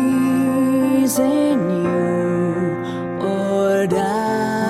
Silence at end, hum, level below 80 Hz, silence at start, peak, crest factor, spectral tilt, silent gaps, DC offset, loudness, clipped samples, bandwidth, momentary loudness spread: 0 s; none; -54 dBFS; 0 s; -6 dBFS; 12 dB; -6 dB/octave; none; under 0.1%; -18 LUFS; under 0.1%; 15.5 kHz; 6 LU